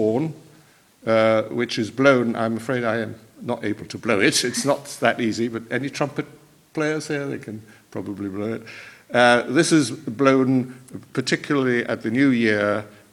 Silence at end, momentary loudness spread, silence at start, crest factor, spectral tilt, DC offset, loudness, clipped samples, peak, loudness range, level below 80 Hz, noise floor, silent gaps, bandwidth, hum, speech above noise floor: 0.2 s; 15 LU; 0 s; 22 dB; -4.5 dB/octave; under 0.1%; -21 LUFS; under 0.1%; 0 dBFS; 7 LU; -66 dBFS; -53 dBFS; none; 15 kHz; none; 32 dB